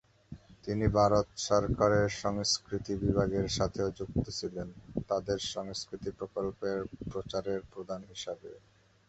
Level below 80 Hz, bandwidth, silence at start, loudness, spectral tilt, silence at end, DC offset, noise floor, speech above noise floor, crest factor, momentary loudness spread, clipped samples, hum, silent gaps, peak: -50 dBFS; 8.4 kHz; 0.3 s; -32 LUFS; -5 dB/octave; 0.5 s; under 0.1%; -52 dBFS; 20 dB; 22 dB; 14 LU; under 0.1%; none; none; -12 dBFS